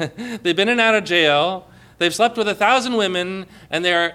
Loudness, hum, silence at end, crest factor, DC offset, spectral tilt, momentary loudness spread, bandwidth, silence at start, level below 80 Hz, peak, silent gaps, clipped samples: -18 LUFS; none; 0 s; 16 dB; under 0.1%; -3.5 dB/octave; 11 LU; 15.5 kHz; 0 s; -58 dBFS; -4 dBFS; none; under 0.1%